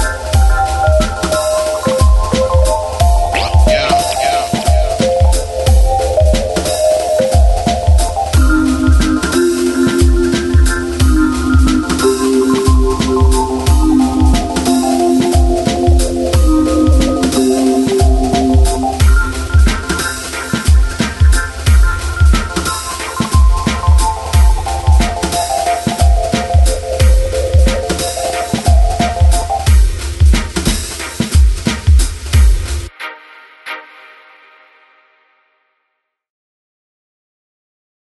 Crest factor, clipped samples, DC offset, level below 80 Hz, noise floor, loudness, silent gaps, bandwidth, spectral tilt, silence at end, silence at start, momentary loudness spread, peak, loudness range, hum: 12 dB; under 0.1%; under 0.1%; -14 dBFS; -70 dBFS; -13 LUFS; none; 12.5 kHz; -5.5 dB/octave; 4.3 s; 0 s; 5 LU; 0 dBFS; 2 LU; none